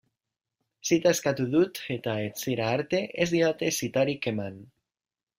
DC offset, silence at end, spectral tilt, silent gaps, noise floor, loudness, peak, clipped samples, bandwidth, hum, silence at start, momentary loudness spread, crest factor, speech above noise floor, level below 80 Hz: under 0.1%; 0.75 s; -4.5 dB/octave; none; under -90 dBFS; -27 LUFS; -8 dBFS; under 0.1%; 16 kHz; none; 0.85 s; 7 LU; 20 dB; over 63 dB; -66 dBFS